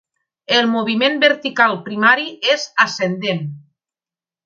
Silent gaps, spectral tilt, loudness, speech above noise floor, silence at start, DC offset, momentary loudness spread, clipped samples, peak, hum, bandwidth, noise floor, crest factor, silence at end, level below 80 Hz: none; -4 dB/octave; -16 LUFS; over 73 dB; 0.5 s; under 0.1%; 7 LU; under 0.1%; 0 dBFS; none; 7.6 kHz; under -90 dBFS; 18 dB; 0.85 s; -70 dBFS